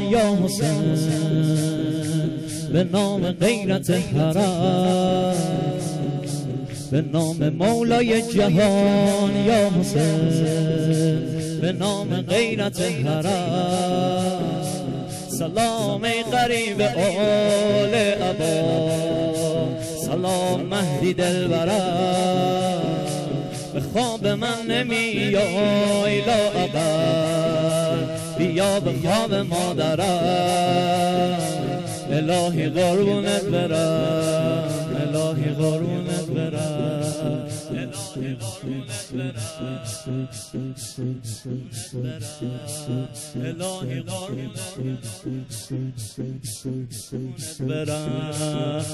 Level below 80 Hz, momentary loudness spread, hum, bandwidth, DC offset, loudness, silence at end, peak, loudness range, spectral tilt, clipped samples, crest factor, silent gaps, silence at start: -50 dBFS; 11 LU; none; 14.5 kHz; under 0.1%; -22 LUFS; 0 s; -8 dBFS; 10 LU; -5.5 dB/octave; under 0.1%; 14 dB; none; 0 s